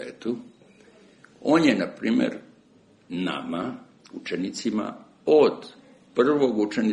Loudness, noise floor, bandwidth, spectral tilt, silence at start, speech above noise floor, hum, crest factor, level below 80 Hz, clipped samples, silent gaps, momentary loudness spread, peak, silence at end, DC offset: -24 LUFS; -57 dBFS; 11 kHz; -5.5 dB/octave; 0 s; 34 dB; none; 20 dB; -68 dBFS; under 0.1%; none; 18 LU; -6 dBFS; 0 s; under 0.1%